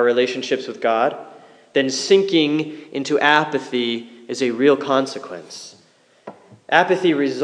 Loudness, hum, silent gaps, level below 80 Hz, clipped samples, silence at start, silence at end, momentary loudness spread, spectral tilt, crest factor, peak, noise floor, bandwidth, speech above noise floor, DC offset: -19 LUFS; none; none; -78 dBFS; under 0.1%; 0 s; 0 s; 17 LU; -4 dB/octave; 20 dB; 0 dBFS; -55 dBFS; 10.5 kHz; 36 dB; under 0.1%